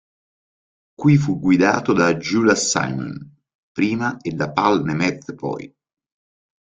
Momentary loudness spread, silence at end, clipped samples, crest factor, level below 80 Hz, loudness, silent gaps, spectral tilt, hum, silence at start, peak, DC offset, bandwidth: 12 LU; 1.1 s; under 0.1%; 18 dB; -56 dBFS; -19 LUFS; 3.55-3.75 s; -5 dB/octave; none; 1 s; -2 dBFS; under 0.1%; 9.4 kHz